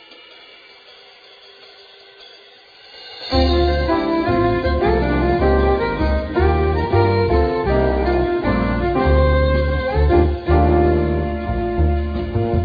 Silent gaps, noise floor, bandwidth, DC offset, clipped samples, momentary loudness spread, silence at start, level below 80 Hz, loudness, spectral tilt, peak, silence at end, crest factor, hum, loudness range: none; -45 dBFS; 5 kHz; under 0.1%; under 0.1%; 6 LU; 2.2 s; -24 dBFS; -18 LUFS; -9 dB/octave; -2 dBFS; 0 s; 16 dB; none; 5 LU